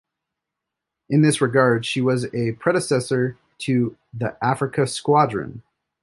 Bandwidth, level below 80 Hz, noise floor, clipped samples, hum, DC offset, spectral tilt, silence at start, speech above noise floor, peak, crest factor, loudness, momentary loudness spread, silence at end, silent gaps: 11.5 kHz; -60 dBFS; -83 dBFS; under 0.1%; none; under 0.1%; -5.5 dB/octave; 1.1 s; 63 dB; -2 dBFS; 18 dB; -21 LUFS; 10 LU; 0.45 s; none